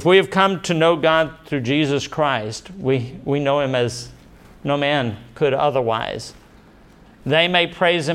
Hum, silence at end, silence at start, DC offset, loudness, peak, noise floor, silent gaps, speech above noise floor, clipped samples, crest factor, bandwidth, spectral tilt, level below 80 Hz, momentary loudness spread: none; 0 s; 0 s; under 0.1%; -19 LUFS; -2 dBFS; -47 dBFS; none; 29 dB; under 0.1%; 18 dB; 13.5 kHz; -5 dB/octave; -52 dBFS; 13 LU